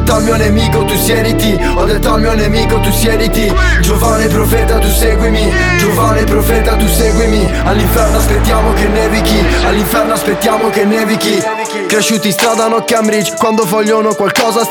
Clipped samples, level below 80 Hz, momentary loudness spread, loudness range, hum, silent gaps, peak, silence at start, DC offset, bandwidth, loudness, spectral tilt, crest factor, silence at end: under 0.1%; -16 dBFS; 2 LU; 1 LU; none; none; 0 dBFS; 0 s; under 0.1%; over 20 kHz; -11 LUFS; -4.5 dB/octave; 10 dB; 0 s